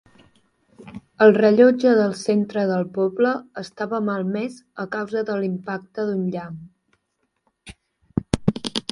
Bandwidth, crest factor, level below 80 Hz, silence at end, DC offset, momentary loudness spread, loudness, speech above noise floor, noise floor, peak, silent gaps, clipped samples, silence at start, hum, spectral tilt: 11.5 kHz; 20 dB; -50 dBFS; 0.1 s; under 0.1%; 18 LU; -21 LUFS; 53 dB; -73 dBFS; 0 dBFS; none; under 0.1%; 0.8 s; none; -6.5 dB/octave